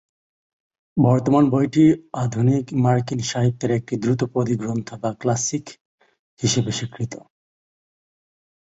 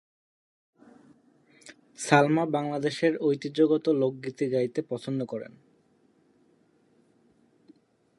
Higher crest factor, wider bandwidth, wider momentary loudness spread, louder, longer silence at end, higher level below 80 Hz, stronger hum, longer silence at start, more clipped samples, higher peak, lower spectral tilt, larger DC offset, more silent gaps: second, 18 dB vs 26 dB; second, 8 kHz vs 11.5 kHz; about the same, 12 LU vs 14 LU; first, -21 LUFS vs -27 LUFS; second, 1.45 s vs 2.7 s; first, -54 dBFS vs -76 dBFS; neither; second, 0.95 s vs 1.65 s; neither; about the same, -2 dBFS vs -4 dBFS; about the same, -6 dB/octave vs -6 dB/octave; neither; first, 5.81-5.98 s, 6.19-6.37 s vs none